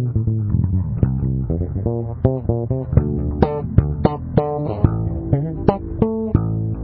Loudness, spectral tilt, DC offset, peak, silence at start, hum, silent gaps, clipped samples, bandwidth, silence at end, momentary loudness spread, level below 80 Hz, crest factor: -20 LUFS; -14.5 dB/octave; under 0.1%; 0 dBFS; 0 s; none; none; under 0.1%; 4.8 kHz; 0 s; 4 LU; -28 dBFS; 18 dB